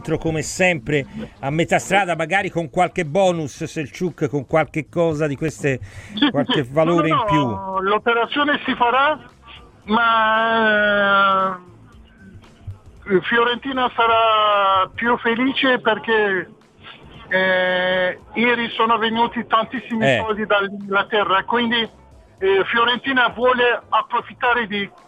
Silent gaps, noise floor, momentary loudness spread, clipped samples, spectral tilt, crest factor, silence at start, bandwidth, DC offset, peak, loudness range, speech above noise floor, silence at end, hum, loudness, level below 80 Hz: none; -45 dBFS; 9 LU; under 0.1%; -5 dB/octave; 16 dB; 0 s; 14.5 kHz; under 0.1%; -2 dBFS; 3 LU; 27 dB; 0.2 s; none; -18 LUFS; -50 dBFS